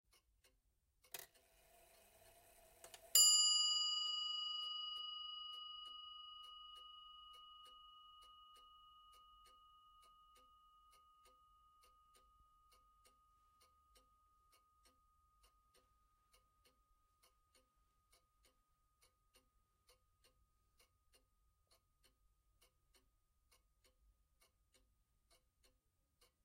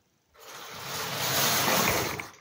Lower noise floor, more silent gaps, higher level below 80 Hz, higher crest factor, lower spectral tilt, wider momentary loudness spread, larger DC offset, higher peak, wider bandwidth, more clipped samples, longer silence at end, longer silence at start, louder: first, -83 dBFS vs -54 dBFS; neither; second, -82 dBFS vs -58 dBFS; first, 30 dB vs 18 dB; second, 3.5 dB/octave vs -2 dB/octave; first, 29 LU vs 19 LU; neither; second, -18 dBFS vs -10 dBFS; about the same, 16 kHz vs 16 kHz; neither; first, 18.1 s vs 0.1 s; first, 1.15 s vs 0.4 s; second, -36 LUFS vs -26 LUFS